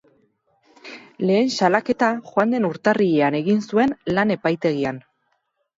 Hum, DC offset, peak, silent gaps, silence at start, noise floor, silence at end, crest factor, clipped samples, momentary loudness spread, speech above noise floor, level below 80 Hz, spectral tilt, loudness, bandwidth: none; under 0.1%; -4 dBFS; none; 0.85 s; -71 dBFS; 0.75 s; 18 dB; under 0.1%; 9 LU; 51 dB; -60 dBFS; -6 dB/octave; -20 LUFS; 7.8 kHz